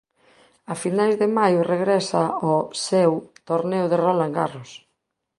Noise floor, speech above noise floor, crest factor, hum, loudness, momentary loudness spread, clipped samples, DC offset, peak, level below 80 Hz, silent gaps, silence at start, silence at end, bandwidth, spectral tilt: -76 dBFS; 55 dB; 18 dB; none; -21 LUFS; 9 LU; under 0.1%; under 0.1%; -4 dBFS; -68 dBFS; none; 0.7 s; 0.6 s; 11.5 kHz; -5.5 dB/octave